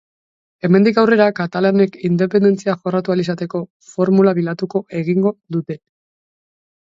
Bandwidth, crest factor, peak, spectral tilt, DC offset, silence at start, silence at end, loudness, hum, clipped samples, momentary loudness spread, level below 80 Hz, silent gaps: 7.6 kHz; 16 dB; 0 dBFS; -8 dB/octave; under 0.1%; 0.65 s; 1.05 s; -17 LUFS; none; under 0.1%; 12 LU; -64 dBFS; 3.70-3.80 s